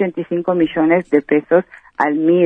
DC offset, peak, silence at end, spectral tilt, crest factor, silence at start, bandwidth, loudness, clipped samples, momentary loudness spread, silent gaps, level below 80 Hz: under 0.1%; 0 dBFS; 0 s; -9 dB/octave; 14 dB; 0 s; 3.8 kHz; -16 LUFS; under 0.1%; 6 LU; none; -56 dBFS